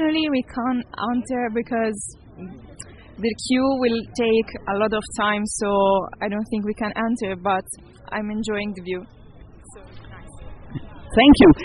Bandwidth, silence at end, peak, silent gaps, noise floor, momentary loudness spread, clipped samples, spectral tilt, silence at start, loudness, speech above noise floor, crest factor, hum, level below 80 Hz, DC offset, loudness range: 11 kHz; 0 s; -2 dBFS; none; -44 dBFS; 20 LU; under 0.1%; -5 dB/octave; 0 s; -21 LUFS; 23 dB; 20 dB; none; -40 dBFS; under 0.1%; 7 LU